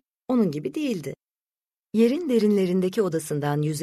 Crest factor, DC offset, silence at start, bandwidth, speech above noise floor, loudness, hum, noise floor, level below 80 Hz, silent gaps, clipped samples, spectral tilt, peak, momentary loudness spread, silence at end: 16 dB; under 0.1%; 0.3 s; 13.5 kHz; over 67 dB; -24 LUFS; none; under -90 dBFS; -66 dBFS; none; under 0.1%; -6.5 dB/octave; -10 dBFS; 8 LU; 0 s